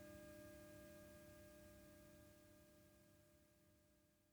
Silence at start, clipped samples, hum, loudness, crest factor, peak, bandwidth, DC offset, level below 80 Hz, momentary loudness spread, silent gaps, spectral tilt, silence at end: 0 s; under 0.1%; none; -63 LUFS; 16 dB; -48 dBFS; over 20 kHz; under 0.1%; -76 dBFS; 8 LU; none; -5 dB/octave; 0 s